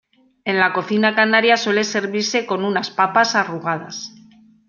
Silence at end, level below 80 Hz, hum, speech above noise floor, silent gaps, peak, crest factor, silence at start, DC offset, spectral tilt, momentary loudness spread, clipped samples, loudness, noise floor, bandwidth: 0.6 s; -68 dBFS; none; 30 dB; none; -2 dBFS; 18 dB; 0.45 s; under 0.1%; -3.5 dB/octave; 12 LU; under 0.1%; -18 LUFS; -49 dBFS; 7.4 kHz